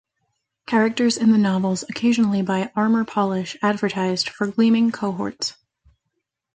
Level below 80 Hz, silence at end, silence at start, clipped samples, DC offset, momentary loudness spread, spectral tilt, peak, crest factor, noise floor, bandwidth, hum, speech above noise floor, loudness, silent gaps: -64 dBFS; 1.05 s; 0.7 s; under 0.1%; under 0.1%; 8 LU; -5.5 dB/octave; -6 dBFS; 16 dB; -78 dBFS; 9.4 kHz; none; 58 dB; -21 LUFS; none